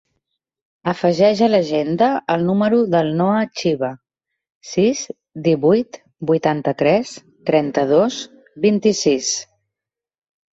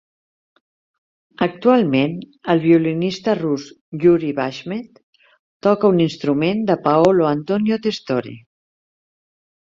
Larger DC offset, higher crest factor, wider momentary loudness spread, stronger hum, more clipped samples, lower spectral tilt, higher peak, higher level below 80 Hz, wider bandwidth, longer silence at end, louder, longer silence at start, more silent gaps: neither; about the same, 16 dB vs 18 dB; about the same, 11 LU vs 10 LU; neither; neither; second, -5 dB/octave vs -7.5 dB/octave; about the same, -2 dBFS vs -2 dBFS; about the same, -60 dBFS vs -60 dBFS; about the same, 8 kHz vs 7.6 kHz; second, 1.1 s vs 1.35 s; about the same, -18 LUFS vs -18 LUFS; second, 0.85 s vs 1.4 s; second, 4.55-4.61 s vs 3.81-3.92 s, 5.03-5.13 s, 5.39-5.60 s